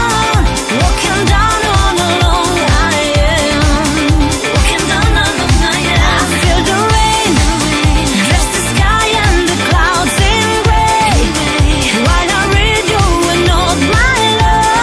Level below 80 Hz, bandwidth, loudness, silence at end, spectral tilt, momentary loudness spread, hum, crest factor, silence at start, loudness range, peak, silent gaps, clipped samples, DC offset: -16 dBFS; 11 kHz; -11 LUFS; 0 s; -4 dB/octave; 2 LU; none; 10 dB; 0 s; 1 LU; 0 dBFS; none; under 0.1%; under 0.1%